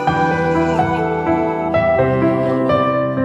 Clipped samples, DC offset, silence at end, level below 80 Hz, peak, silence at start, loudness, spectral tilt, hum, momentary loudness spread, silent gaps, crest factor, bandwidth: under 0.1%; 0.1%; 0 s; -42 dBFS; -4 dBFS; 0 s; -16 LUFS; -8 dB/octave; none; 3 LU; none; 12 dB; 8.6 kHz